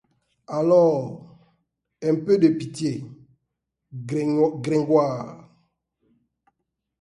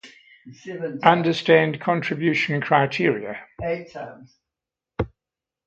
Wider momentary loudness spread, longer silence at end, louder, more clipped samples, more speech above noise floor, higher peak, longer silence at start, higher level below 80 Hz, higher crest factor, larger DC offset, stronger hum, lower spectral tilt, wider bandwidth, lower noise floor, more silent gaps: about the same, 20 LU vs 19 LU; first, 1.6 s vs 0.6 s; about the same, -22 LUFS vs -22 LUFS; neither; second, 59 dB vs 66 dB; second, -6 dBFS vs 0 dBFS; first, 0.5 s vs 0.05 s; second, -66 dBFS vs -50 dBFS; about the same, 18 dB vs 22 dB; neither; neither; about the same, -7.5 dB/octave vs -6.5 dB/octave; first, 11.5 kHz vs 8 kHz; second, -80 dBFS vs -88 dBFS; neither